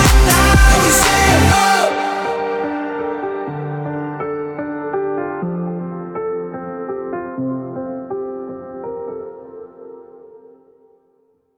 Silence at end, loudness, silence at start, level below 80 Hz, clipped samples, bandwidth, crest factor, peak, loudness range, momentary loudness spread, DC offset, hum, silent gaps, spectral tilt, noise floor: 1.2 s; -17 LUFS; 0 s; -24 dBFS; under 0.1%; 19.5 kHz; 16 dB; 0 dBFS; 16 LU; 18 LU; under 0.1%; none; none; -4 dB/octave; -60 dBFS